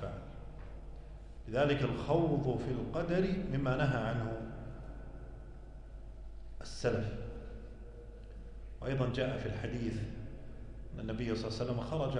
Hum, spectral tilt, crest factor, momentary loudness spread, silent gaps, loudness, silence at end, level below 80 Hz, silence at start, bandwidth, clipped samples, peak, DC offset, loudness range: none; -7.5 dB/octave; 18 dB; 20 LU; none; -36 LUFS; 0 s; -48 dBFS; 0 s; 10.5 kHz; under 0.1%; -18 dBFS; under 0.1%; 9 LU